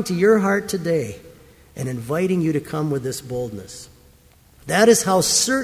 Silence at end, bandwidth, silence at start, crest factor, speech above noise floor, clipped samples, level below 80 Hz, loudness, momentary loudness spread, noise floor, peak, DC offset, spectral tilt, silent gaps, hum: 0 s; 16 kHz; 0 s; 20 dB; 32 dB; under 0.1%; -52 dBFS; -20 LUFS; 21 LU; -52 dBFS; -2 dBFS; under 0.1%; -4 dB/octave; none; none